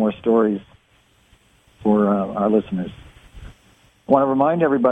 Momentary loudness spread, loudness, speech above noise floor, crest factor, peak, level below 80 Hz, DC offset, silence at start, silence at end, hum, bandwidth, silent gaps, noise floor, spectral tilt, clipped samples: 10 LU; -19 LUFS; 40 dB; 18 dB; -2 dBFS; -50 dBFS; under 0.1%; 0 s; 0 s; none; 8.2 kHz; none; -58 dBFS; -9.5 dB/octave; under 0.1%